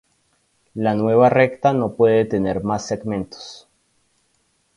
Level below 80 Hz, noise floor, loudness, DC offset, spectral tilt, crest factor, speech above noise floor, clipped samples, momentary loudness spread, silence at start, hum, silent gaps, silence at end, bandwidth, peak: -52 dBFS; -65 dBFS; -18 LUFS; under 0.1%; -6.5 dB/octave; 20 dB; 47 dB; under 0.1%; 18 LU; 0.75 s; none; none; 1.2 s; 11 kHz; 0 dBFS